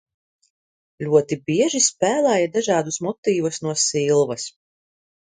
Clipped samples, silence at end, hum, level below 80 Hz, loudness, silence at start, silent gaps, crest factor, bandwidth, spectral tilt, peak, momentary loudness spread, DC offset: under 0.1%; 0.85 s; none; -66 dBFS; -20 LUFS; 1 s; 3.18-3.23 s; 18 dB; 9.6 kHz; -3.5 dB/octave; -2 dBFS; 7 LU; under 0.1%